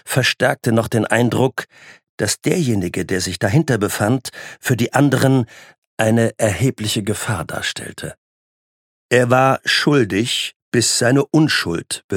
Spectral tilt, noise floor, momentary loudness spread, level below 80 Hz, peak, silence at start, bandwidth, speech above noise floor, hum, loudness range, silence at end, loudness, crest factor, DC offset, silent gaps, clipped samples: -4.5 dB/octave; under -90 dBFS; 10 LU; -52 dBFS; 0 dBFS; 0.05 s; 17 kHz; over 73 dB; none; 5 LU; 0 s; -17 LUFS; 18 dB; under 0.1%; 2.09-2.18 s, 5.78-5.97 s, 8.18-9.09 s, 10.56-10.72 s, 12.04-12.09 s; under 0.1%